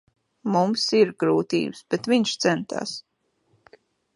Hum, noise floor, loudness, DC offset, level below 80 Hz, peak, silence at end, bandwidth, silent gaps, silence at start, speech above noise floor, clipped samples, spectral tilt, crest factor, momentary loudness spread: none; -67 dBFS; -23 LUFS; under 0.1%; -70 dBFS; -6 dBFS; 1.15 s; 11.5 kHz; none; 0.45 s; 45 dB; under 0.1%; -4.5 dB/octave; 18 dB; 11 LU